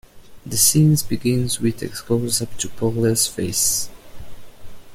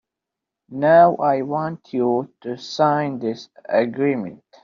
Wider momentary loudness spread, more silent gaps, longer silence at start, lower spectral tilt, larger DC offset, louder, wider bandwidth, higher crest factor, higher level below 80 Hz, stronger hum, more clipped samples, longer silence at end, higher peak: second, 10 LU vs 18 LU; neither; second, 0.15 s vs 0.7 s; about the same, -4 dB/octave vs -5 dB/octave; neither; about the same, -19 LUFS vs -20 LUFS; first, 16.5 kHz vs 7.2 kHz; about the same, 20 dB vs 18 dB; first, -44 dBFS vs -66 dBFS; neither; neither; second, 0 s vs 0.25 s; about the same, -2 dBFS vs -2 dBFS